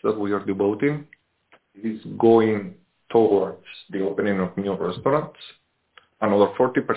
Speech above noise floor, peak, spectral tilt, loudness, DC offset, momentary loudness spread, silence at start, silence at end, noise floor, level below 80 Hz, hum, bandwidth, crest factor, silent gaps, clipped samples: 38 dB; -4 dBFS; -11 dB/octave; -22 LUFS; under 0.1%; 15 LU; 0.05 s; 0 s; -60 dBFS; -60 dBFS; none; 4 kHz; 18 dB; none; under 0.1%